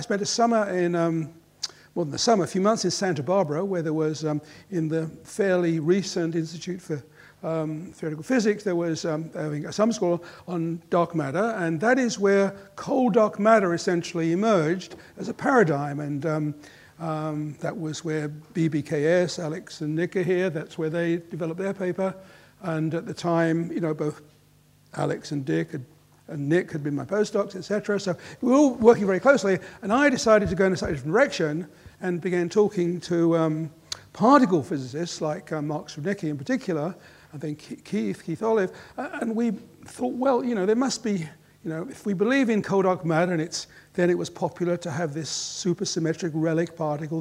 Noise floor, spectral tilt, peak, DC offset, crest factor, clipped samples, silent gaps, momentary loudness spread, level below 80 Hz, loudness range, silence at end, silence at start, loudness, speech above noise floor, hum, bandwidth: -58 dBFS; -5.5 dB/octave; -4 dBFS; under 0.1%; 22 dB; under 0.1%; none; 13 LU; -60 dBFS; 6 LU; 0 s; 0 s; -25 LUFS; 33 dB; none; 15 kHz